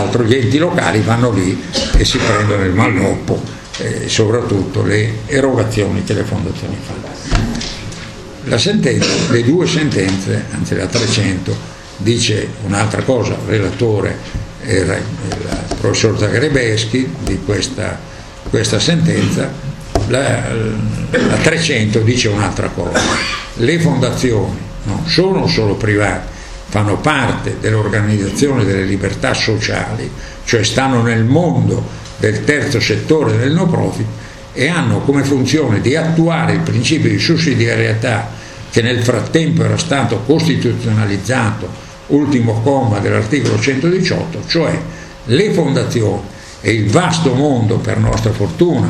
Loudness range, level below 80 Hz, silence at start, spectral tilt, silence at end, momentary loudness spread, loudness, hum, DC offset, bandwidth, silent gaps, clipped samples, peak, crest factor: 3 LU; -30 dBFS; 0 s; -5.5 dB/octave; 0 s; 9 LU; -14 LUFS; none; under 0.1%; 12.5 kHz; none; under 0.1%; 0 dBFS; 14 dB